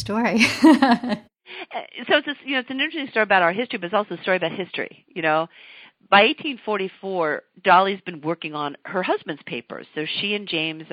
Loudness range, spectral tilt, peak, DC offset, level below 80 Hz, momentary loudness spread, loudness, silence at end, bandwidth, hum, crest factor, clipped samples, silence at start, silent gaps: 3 LU; -4.5 dB/octave; -2 dBFS; under 0.1%; -64 dBFS; 16 LU; -21 LUFS; 0.05 s; 14 kHz; none; 20 dB; under 0.1%; 0 s; none